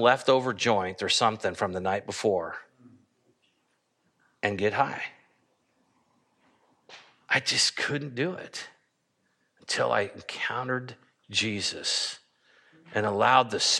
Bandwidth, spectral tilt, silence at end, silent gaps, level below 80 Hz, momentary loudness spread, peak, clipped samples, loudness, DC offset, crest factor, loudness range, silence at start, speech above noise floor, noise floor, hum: 13 kHz; -2.5 dB/octave; 0 s; none; -72 dBFS; 16 LU; -4 dBFS; under 0.1%; -27 LUFS; under 0.1%; 24 dB; 6 LU; 0 s; 47 dB; -74 dBFS; none